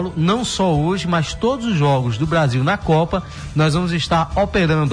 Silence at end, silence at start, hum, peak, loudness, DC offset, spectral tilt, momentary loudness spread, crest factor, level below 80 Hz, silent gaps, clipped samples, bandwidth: 0 s; 0 s; none; -6 dBFS; -18 LUFS; under 0.1%; -6 dB/octave; 3 LU; 12 dB; -36 dBFS; none; under 0.1%; 10.5 kHz